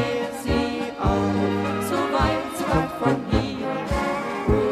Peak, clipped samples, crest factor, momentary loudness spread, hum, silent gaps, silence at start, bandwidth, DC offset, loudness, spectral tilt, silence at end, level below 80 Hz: -6 dBFS; under 0.1%; 16 dB; 4 LU; none; none; 0 s; 15.5 kHz; under 0.1%; -24 LUFS; -6 dB/octave; 0 s; -34 dBFS